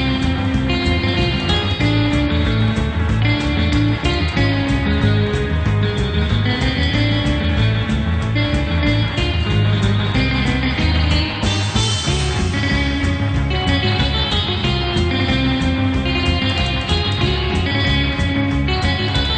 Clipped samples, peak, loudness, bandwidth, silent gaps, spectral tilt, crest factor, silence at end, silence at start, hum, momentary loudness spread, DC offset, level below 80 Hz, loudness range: under 0.1%; -4 dBFS; -17 LUFS; 9.2 kHz; none; -5.5 dB/octave; 14 dB; 0 s; 0 s; none; 2 LU; under 0.1%; -24 dBFS; 0 LU